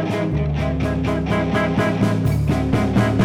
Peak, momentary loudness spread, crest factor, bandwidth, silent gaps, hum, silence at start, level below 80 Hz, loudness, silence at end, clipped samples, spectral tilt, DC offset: -4 dBFS; 3 LU; 14 dB; 15.5 kHz; none; none; 0 s; -30 dBFS; -20 LUFS; 0 s; under 0.1%; -7.5 dB/octave; under 0.1%